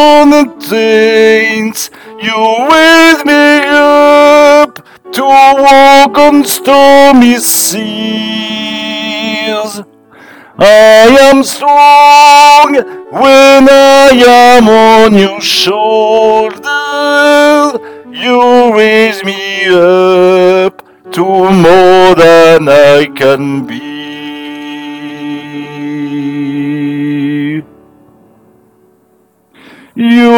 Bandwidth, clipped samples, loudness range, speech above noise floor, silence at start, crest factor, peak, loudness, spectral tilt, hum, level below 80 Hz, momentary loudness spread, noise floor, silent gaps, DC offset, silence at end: over 20 kHz; 20%; 13 LU; 45 dB; 0 s; 6 dB; 0 dBFS; -5 LUFS; -3.5 dB/octave; none; -42 dBFS; 18 LU; -50 dBFS; none; under 0.1%; 0 s